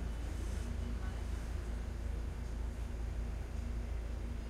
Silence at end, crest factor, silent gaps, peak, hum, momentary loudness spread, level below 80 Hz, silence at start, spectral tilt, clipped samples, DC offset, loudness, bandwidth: 0 s; 10 dB; none; -28 dBFS; none; 2 LU; -40 dBFS; 0 s; -6.5 dB/octave; under 0.1%; under 0.1%; -43 LUFS; 12.5 kHz